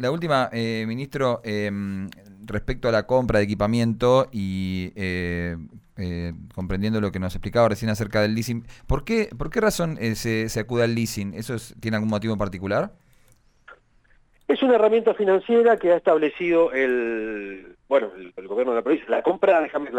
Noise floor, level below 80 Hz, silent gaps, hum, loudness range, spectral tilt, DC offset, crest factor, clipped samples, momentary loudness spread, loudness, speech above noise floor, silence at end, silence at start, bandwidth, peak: -58 dBFS; -42 dBFS; none; none; 6 LU; -6 dB/octave; under 0.1%; 16 dB; under 0.1%; 13 LU; -23 LUFS; 35 dB; 0 s; 0 s; 19.5 kHz; -6 dBFS